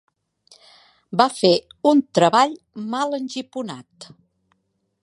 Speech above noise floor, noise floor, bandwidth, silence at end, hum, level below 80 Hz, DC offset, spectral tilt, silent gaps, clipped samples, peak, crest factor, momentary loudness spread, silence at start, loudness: 50 dB; -70 dBFS; 11.5 kHz; 1 s; none; -70 dBFS; under 0.1%; -5 dB/octave; none; under 0.1%; 0 dBFS; 22 dB; 15 LU; 1.1 s; -20 LUFS